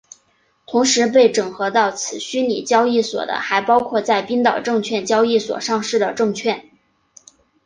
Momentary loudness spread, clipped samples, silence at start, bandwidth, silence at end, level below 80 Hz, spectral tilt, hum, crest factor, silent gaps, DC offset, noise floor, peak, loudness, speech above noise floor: 8 LU; under 0.1%; 0.7 s; 10 kHz; 1.05 s; -64 dBFS; -3 dB/octave; none; 16 dB; none; under 0.1%; -61 dBFS; -2 dBFS; -18 LUFS; 44 dB